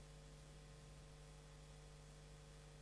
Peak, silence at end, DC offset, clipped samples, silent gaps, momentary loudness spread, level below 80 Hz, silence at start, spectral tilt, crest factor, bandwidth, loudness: -50 dBFS; 0 s; under 0.1%; under 0.1%; none; 0 LU; -64 dBFS; 0 s; -4.5 dB/octave; 10 dB; 11 kHz; -61 LUFS